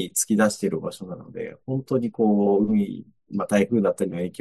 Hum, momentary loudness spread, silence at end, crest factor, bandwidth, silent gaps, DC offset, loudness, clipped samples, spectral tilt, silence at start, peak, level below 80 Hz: none; 15 LU; 0.05 s; 18 dB; 12.5 kHz; none; under 0.1%; -23 LUFS; under 0.1%; -5.5 dB/octave; 0 s; -6 dBFS; -64 dBFS